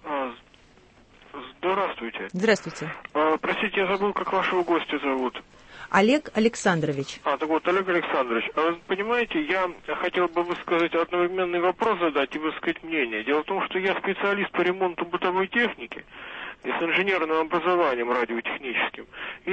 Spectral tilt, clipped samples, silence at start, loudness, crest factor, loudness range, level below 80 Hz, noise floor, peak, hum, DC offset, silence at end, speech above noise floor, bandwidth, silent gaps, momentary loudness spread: -5 dB/octave; under 0.1%; 0.05 s; -25 LUFS; 20 dB; 2 LU; -60 dBFS; -55 dBFS; -6 dBFS; none; under 0.1%; 0 s; 30 dB; 8.8 kHz; none; 10 LU